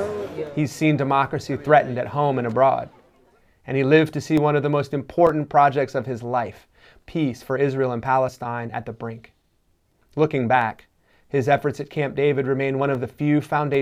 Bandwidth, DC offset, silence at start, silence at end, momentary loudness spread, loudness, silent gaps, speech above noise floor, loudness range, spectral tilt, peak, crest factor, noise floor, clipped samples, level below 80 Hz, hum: 15 kHz; under 0.1%; 0 s; 0 s; 11 LU; -22 LUFS; none; 44 dB; 5 LU; -7 dB/octave; -2 dBFS; 20 dB; -65 dBFS; under 0.1%; -58 dBFS; none